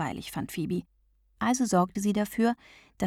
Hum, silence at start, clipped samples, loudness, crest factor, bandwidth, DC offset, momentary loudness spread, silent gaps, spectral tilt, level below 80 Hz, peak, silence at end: none; 0 s; under 0.1%; -29 LUFS; 18 dB; 16 kHz; under 0.1%; 10 LU; none; -5.5 dB/octave; -58 dBFS; -12 dBFS; 0 s